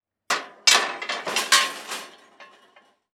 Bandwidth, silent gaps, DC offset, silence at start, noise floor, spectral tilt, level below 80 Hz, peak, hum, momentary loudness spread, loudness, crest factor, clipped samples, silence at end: over 20 kHz; none; under 0.1%; 0.3 s; -58 dBFS; 2 dB/octave; -80 dBFS; -2 dBFS; none; 16 LU; -21 LUFS; 24 dB; under 0.1%; 0.7 s